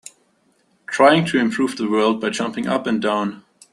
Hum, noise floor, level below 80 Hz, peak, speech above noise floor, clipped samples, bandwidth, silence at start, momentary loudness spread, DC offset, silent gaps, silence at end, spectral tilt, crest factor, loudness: none; -62 dBFS; -62 dBFS; -2 dBFS; 44 dB; under 0.1%; 12 kHz; 0.9 s; 9 LU; under 0.1%; none; 0.35 s; -5 dB/octave; 18 dB; -19 LUFS